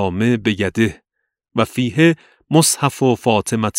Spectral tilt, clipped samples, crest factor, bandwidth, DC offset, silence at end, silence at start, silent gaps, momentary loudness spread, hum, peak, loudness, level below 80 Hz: -4.5 dB/octave; under 0.1%; 18 dB; 16 kHz; under 0.1%; 0 s; 0 s; none; 6 LU; none; 0 dBFS; -17 LUFS; -50 dBFS